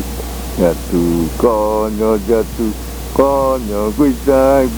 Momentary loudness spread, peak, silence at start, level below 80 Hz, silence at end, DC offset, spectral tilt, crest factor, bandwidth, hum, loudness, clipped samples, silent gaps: 8 LU; 0 dBFS; 0 s; -26 dBFS; 0 s; under 0.1%; -6.5 dB/octave; 14 dB; over 20 kHz; none; -15 LUFS; under 0.1%; none